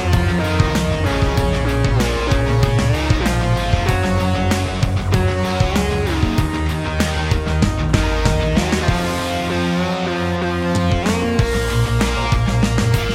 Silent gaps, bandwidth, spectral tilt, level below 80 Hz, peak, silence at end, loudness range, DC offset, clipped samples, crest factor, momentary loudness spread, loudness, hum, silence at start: none; 16.5 kHz; -5.5 dB/octave; -24 dBFS; -2 dBFS; 0 s; 1 LU; under 0.1%; under 0.1%; 16 dB; 3 LU; -18 LUFS; none; 0 s